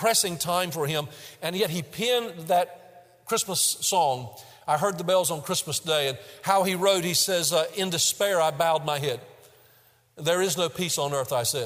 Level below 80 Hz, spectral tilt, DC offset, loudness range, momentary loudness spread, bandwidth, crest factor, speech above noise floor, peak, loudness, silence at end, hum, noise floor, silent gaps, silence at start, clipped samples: -68 dBFS; -2.5 dB/octave; under 0.1%; 3 LU; 9 LU; 16 kHz; 18 dB; 34 dB; -8 dBFS; -25 LUFS; 0 s; none; -60 dBFS; none; 0 s; under 0.1%